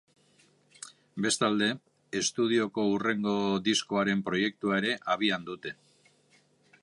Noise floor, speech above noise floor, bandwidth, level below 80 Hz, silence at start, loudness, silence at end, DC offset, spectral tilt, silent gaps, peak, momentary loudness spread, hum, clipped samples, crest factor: -65 dBFS; 37 dB; 11.5 kHz; -70 dBFS; 0.8 s; -29 LUFS; 1.1 s; under 0.1%; -3.5 dB/octave; none; -12 dBFS; 15 LU; none; under 0.1%; 18 dB